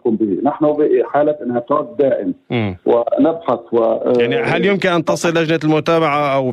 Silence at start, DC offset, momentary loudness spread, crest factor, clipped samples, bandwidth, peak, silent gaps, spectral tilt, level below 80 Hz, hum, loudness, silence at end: 0.05 s; under 0.1%; 5 LU; 12 dB; under 0.1%; 13 kHz; -2 dBFS; none; -6 dB/octave; -56 dBFS; none; -16 LUFS; 0 s